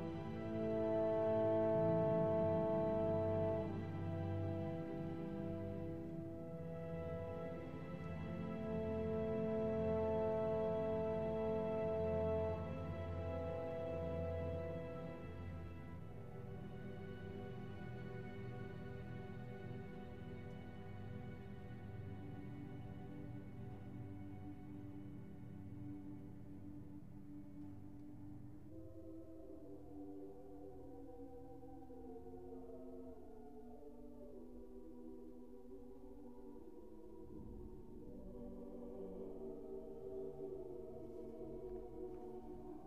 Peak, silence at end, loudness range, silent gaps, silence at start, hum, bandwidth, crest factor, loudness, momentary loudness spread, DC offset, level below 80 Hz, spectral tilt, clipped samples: -26 dBFS; 0 s; 16 LU; none; 0 s; none; 8.8 kHz; 18 dB; -44 LUFS; 18 LU; 0.1%; -62 dBFS; -9.5 dB/octave; under 0.1%